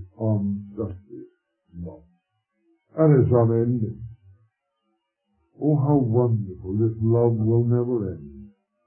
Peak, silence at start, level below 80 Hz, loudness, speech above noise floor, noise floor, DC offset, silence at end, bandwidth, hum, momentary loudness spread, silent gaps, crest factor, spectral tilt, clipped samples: -6 dBFS; 0 s; -54 dBFS; -22 LUFS; 54 dB; -75 dBFS; under 0.1%; 0.4 s; 2.4 kHz; none; 21 LU; none; 18 dB; -15.5 dB/octave; under 0.1%